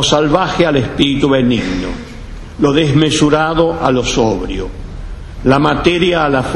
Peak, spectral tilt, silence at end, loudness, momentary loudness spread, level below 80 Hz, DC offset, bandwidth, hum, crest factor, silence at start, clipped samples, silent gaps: 0 dBFS; -5 dB/octave; 0 s; -13 LUFS; 18 LU; -28 dBFS; under 0.1%; 11.5 kHz; none; 14 dB; 0 s; under 0.1%; none